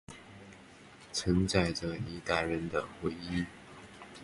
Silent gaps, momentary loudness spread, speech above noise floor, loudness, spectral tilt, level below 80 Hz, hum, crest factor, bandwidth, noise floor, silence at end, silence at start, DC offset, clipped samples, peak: none; 23 LU; 22 dB; -33 LUFS; -5 dB/octave; -50 dBFS; none; 22 dB; 11.5 kHz; -54 dBFS; 0 s; 0.1 s; under 0.1%; under 0.1%; -12 dBFS